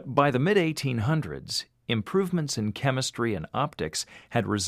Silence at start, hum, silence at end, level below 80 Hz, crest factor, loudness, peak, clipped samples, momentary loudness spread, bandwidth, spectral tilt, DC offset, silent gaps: 0 s; none; 0 s; -56 dBFS; 20 dB; -27 LUFS; -6 dBFS; under 0.1%; 8 LU; 15.5 kHz; -5 dB/octave; under 0.1%; none